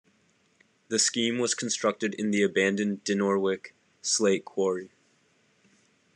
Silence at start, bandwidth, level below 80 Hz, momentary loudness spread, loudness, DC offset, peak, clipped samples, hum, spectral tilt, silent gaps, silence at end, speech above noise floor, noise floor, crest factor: 0.9 s; 11 kHz; -78 dBFS; 6 LU; -27 LUFS; under 0.1%; -10 dBFS; under 0.1%; none; -3 dB/octave; none; 1.3 s; 40 dB; -67 dBFS; 18 dB